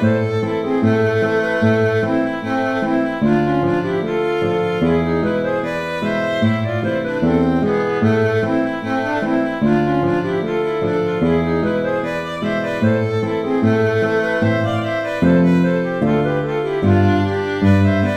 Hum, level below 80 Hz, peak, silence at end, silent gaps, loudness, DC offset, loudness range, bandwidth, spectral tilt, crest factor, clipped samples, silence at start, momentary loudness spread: none; -44 dBFS; -2 dBFS; 0 s; none; -18 LUFS; under 0.1%; 2 LU; 10.5 kHz; -8 dB/octave; 14 dB; under 0.1%; 0 s; 5 LU